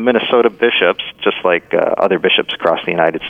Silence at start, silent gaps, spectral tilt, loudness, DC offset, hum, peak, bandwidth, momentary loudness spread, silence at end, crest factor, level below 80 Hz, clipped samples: 0 s; none; -6.5 dB/octave; -14 LUFS; under 0.1%; none; 0 dBFS; 5 kHz; 4 LU; 0 s; 14 dB; -58 dBFS; under 0.1%